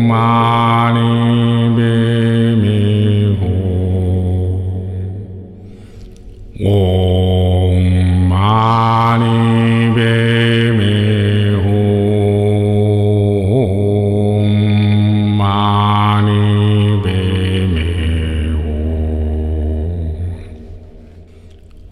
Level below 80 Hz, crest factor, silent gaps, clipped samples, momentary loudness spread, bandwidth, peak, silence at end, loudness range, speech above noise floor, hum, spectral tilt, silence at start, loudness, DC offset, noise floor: -28 dBFS; 10 dB; none; under 0.1%; 7 LU; 11 kHz; -2 dBFS; 0 s; 7 LU; 27 dB; none; -8 dB/octave; 0 s; -13 LUFS; 0.2%; -38 dBFS